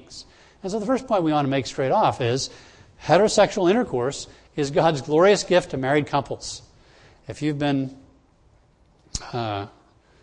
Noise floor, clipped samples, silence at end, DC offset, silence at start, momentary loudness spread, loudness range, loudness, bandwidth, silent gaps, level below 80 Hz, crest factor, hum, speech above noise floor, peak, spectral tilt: -58 dBFS; under 0.1%; 0.55 s; under 0.1%; 0.1 s; 17 LU; 10 LU; -22 LUFS; 10.5 kHz; none; -52 dBFS; 20 dB; none; 36 dB; -4 dBFS; -5 dB/octave